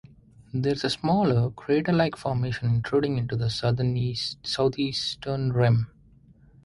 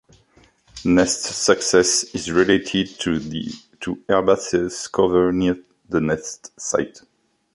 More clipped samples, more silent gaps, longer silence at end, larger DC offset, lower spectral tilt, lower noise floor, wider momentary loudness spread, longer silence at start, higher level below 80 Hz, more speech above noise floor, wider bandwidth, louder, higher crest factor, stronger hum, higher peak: neither; neither; first, 0.8 s vs 0.65 s; neither; first, -6.5 dB/octave vs -3.5 dB/octave; about the same, -55 dBFS vs -56 dBFS; second, 6 LU vs 14 LU; second, 0.55 s vs 0.75 s; about the same, -52 dBFS vs -48 dBFS; second, 30 dB vs 36 dB; about the same, 11.5 kHz vs 11.5 kHz; second, -26 LUFS vs -20 LUFS; about the same, 16 dB vs 20 dB; neither; second, -10 dBFS vs -2 dBFS